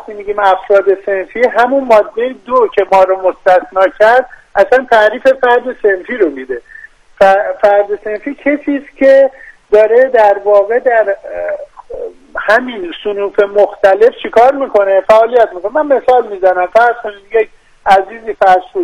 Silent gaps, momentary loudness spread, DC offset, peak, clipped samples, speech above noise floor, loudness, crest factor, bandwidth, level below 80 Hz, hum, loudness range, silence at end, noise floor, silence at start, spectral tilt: none; 12 LU; under 0.1%; 0 dBFS; 2%; 26 dB; -11 LUFS; 10 dB; 10.5 kHz; -46 dBFS; none; 3 LU; 0 s; -36 dBFS; 0.1 s; -4.5 dB/octave